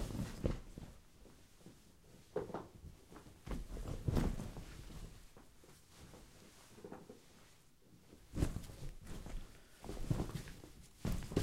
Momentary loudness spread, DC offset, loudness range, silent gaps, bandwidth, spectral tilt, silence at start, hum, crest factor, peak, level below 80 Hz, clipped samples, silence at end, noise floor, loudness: 22 LU; under 0.1%; 11 LU; none; 16 kHz; -6.5 dB/octave; 0 s; none; 26 dB; -20 dBFS; -50 dBFS; under 0.1%; 0 s; -66 dBFS; -46 LUFS